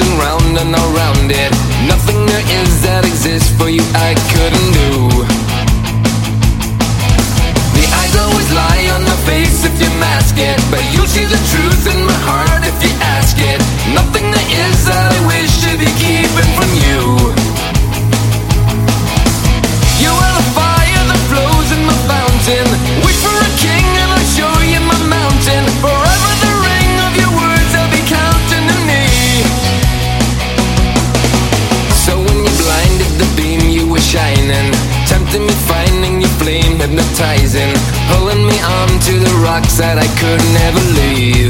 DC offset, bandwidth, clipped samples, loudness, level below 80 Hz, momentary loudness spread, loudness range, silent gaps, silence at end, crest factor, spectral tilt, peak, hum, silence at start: under 0.1%; 17 kHz; under 0.1%; -11 LUFS; -16 dBFS; 3 LU; 1 LU; none; 0 s; 10 dB; -4.5 dB/octave; 0 dBFS; none; 0 s